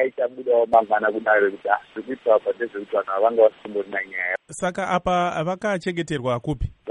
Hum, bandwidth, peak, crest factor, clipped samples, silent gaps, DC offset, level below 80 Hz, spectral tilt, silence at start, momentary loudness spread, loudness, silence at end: none; 11.5 kHz; -4 dBFS; 18 dB; under 0.1%; none; under 0.1%; -44 dBFS; -5.5 dB/octave; 0 s; 9 LU; -22 LUFS; 0 s